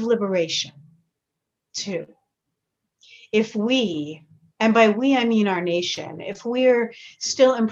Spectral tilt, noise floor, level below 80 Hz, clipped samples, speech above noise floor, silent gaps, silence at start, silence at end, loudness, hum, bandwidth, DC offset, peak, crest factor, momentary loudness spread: -4 dB/octave; -82 dBFS; -70 dBFS; under 0.1%; 61 dB; none; 0 s; 0 s; -21 LUFS; none; 8 kHz; under 0.1%; -4 dBFS; 18 dB; 15 LU